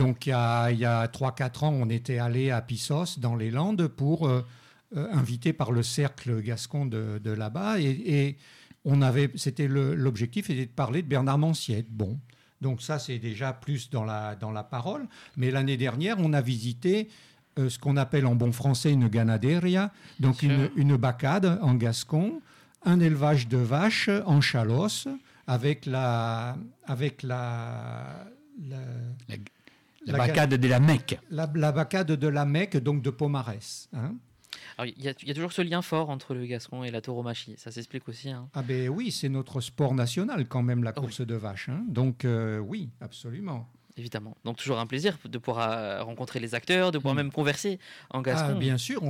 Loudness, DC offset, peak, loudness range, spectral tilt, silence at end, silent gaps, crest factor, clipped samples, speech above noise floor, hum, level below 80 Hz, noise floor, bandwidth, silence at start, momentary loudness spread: -28 LUFS; under 0.1%; -14 dBFS; 8 LU; -6.5 dB/octave; 0 s; none; 14 dB; under 0.1%; 29 dB; none; -64 dBFS; -56 dBFS; 15 kHz; 0 s; 14 LU